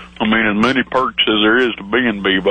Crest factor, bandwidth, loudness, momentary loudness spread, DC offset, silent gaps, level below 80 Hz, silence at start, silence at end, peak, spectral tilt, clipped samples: 12 dB; 9 kHz; -15 LUFS; 4 LU; under 0.1%; none; -44 dBFS; 0 s; 0 s; -2 dBFS; -5.5 dB/octave; under 0.1%